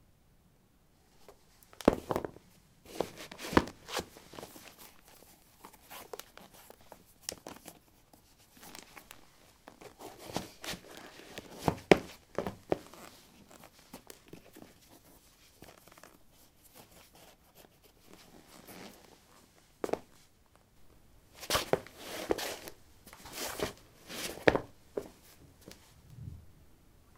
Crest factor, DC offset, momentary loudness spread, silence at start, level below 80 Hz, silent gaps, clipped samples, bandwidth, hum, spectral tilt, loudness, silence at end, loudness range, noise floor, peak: 38 dB; under 0.1%; 27 LU; 1.2 s; -60 dBFS; none; under 0.1%; 17 kHz; none; -4 dB/octave; -36 LUFS; 0.65 s; 20 LU; -66 dBFS; -2 dBFS